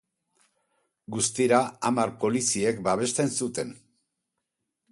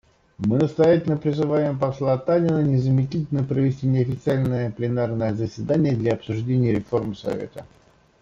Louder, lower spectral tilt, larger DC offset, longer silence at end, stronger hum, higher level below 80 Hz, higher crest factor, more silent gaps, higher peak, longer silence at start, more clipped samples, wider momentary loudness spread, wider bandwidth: second, -26 LUFS vs -22 LUFS; second, -4 dB/octave vs -9 dB/octave; neither; first, 1.15 s vs 0.55 s; neither; second, -64 dBFS vs -52 dBFS; first, 22 dB vs 16 dB; neither; about the same, -8 dBFS vs -6 dBFS; first, 1.1 s vs 0.4 s; neither; about the same, 9 LU vs 8 LU; first, 11.5 kHz vs 7.4 kHz